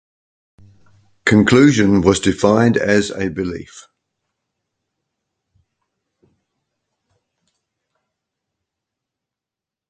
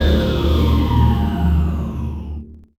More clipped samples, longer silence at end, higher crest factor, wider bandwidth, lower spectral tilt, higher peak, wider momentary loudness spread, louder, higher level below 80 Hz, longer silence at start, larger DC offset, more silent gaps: neither; first, 6.1 s vs 0.2 s; first, 20 dB vs 14 dB; second, 9.4 kHz vs 13.5 kHz; second, -5.5 dB/octave vs -8 dB/octave; first, 0 dBFS vs -4 dBFS; about the same, 12 LU vs 13 LU; first, -15 LUFS vs -18 LUFS; second, -44 dBFS vs -20 dBFS; first, 1.25 s vs 0 s; neither; neither